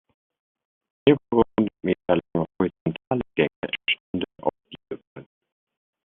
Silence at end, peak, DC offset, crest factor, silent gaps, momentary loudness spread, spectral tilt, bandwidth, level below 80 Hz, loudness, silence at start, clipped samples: 0.9 s; -4 dBFS; under 0.1%; 22 dB; 2.81-2.86 s, 3.07-3.11 s, 3.56-3.62 s, 4.00-4.14 s, 5.07-5.16 s; 11 LU; -4.5 dB/octave; 4.1 kHz; -56 dBFS; -25 LUFS; 1.05 s; under 0.1%